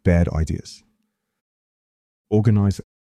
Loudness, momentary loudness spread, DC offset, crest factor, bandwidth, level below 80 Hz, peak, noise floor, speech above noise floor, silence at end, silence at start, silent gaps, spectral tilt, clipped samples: -21 LUFS; 14 LU; under 0.1%; 16 dB; 10.5 kHz; -36 dBFS; -6 dBFS; -73 dBFS; 54 dB; 0.35 s; 0.05 s; 1.41-2.25 s; -8 dB/octave; under 0.1%